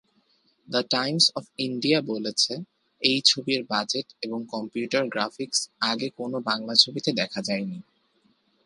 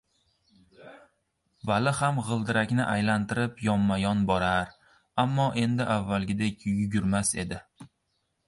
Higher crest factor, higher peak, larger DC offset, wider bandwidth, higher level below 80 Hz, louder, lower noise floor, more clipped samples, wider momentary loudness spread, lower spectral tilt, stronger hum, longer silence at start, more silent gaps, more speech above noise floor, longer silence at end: first, 26 dB vs 18 dB; first, -2 dBFS vs -10 dBFS; neither; about the same, 11.5 kHz vs 11.5 kHz; second, -76 dBFS vs -52 dBFS; first, -24 LUFS vs -27 LUFS; second, -66 dBFS vs -76 dBFS; neither; first, 12 LU vs 4 LU; second, -3 dB/octave vs -5.5 dB/octave; neither; about the same, 0.7 s vs 0.8 s; neither; second, 40 dB vs 50 dB; first, 0.85 s vs 0.6 s